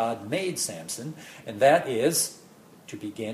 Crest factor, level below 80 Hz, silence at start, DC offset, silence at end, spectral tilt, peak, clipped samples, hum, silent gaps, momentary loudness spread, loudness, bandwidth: 20 dB; -72 dBFS; 0 s; under 0.1%; 0 s; -3.5 dB/octave; -8 dBFS; under 0.1%; none; none; 18 LU; -25 LUFS; 15.5 kHz